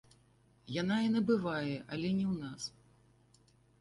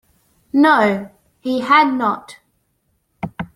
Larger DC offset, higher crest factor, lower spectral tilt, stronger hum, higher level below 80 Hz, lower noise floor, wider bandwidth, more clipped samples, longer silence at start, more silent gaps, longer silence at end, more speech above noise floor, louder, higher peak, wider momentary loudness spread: neither; about the same, 16 dB vs 18 dB; about the same, -6 dB/octave vs -6 dB/octave; neither; second, -68 dBFS vs -56 dBFS; about the same, -67 dBFS vs -66 dBFS; second, 11.5 kHz vs 13 kHz; neither; about the same, 0.65 s vs 0.55 s; neither; first, 1.1 s vs 0.1 s; second, 33 dB vs 51 dB; second, -35 LUFS vs -16 LUFS; second, -20 dBFS vs -2 dBFS; second, 11 LU vs 18 LU